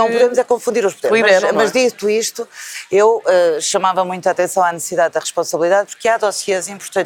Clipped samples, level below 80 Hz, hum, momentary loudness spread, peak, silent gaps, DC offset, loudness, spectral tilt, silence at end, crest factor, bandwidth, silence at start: under 0.1%; -66 dBFS; none; 7 LU; 0 dBFS; none; under 0.1%; -15 LUFS; -2.5 dB/octave; 0 s; 16 dB; 18 kHz; 0 s